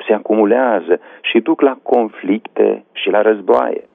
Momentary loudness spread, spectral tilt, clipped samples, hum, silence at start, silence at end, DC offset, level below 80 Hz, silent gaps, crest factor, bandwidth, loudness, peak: 6 LU; -8 dB/octave; under 0.1%; none; 0 s; 0.15 s; under 0.1%; -64 dBFS; none; 14 dB; 3.9 kHz; -15 LUFS; -2 dBFS